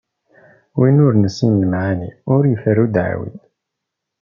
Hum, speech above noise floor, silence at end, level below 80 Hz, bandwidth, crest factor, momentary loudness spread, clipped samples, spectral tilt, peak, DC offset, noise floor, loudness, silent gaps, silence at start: none; 65 dB; 0.85 s; -54 dBFS; 7.2 kHz; 16 dB; 12 LU; under 0.1%; -8.5 dB/octave; -2 dBFS; under 0.1%; -79 dBFS; -16 LUFS; none; 0.75 s